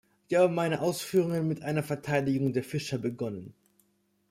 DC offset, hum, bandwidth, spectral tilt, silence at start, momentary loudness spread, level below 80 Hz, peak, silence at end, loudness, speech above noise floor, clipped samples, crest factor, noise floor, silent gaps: under 0.1%; none; 16 kHz; -6 dB/octave; 0.3 s; 8 LU; -66 dBFS; -12 dBFS; 0.8 s; -29 LUFS; 43 dB; under 0.1%; 18 dB; -71 dBFS; none